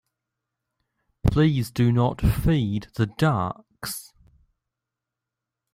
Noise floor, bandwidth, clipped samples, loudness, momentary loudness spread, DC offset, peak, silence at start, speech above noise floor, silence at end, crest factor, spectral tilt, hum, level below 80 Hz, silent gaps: -86 dBFS; 16 kHz; under 0.1%; -24 LUFS; 12 LU; under 0.1%; -6 dBFS; 1.25 s; 64 dB; 1.7 s; 20 dB; -7 dB/octave; none; -38 dBFS; none